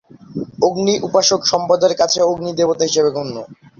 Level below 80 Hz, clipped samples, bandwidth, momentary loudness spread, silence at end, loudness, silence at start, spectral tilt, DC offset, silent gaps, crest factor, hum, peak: -56 dBFS; under 0.1%; 7.6 kHz; 14 LU; 0.25 s; -16 LUFS; 0.3 s; -3.5 dB/octave; under 0.1%; none; 16 dB; none; -2 dBFS